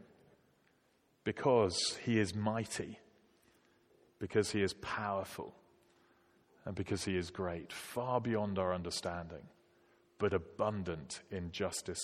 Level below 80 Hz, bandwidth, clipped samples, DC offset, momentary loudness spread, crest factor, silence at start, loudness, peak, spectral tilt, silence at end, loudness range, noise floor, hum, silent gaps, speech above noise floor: -66 dBFS; 16 kHz; under 0.1%; under 0.1%; 13 LU; 22 dB; 1.25 s; -37 LUFS; -16 dBFS; -4.5 dB/octave; 0 s; 4 LU; -74 dBFS; none; none; 37 dB